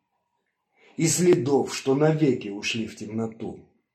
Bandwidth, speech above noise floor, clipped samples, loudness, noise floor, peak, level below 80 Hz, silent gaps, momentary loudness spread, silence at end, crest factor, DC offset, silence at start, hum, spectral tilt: 15 kHz; 53 dB; under 0.1%; -24 LUFS; -77 dBFS; -8 dBFS; -68 dBFS; none; 14 LU; 0.35 s; 18 dB; under 0.1%; 1 s; none; -5 dB/octave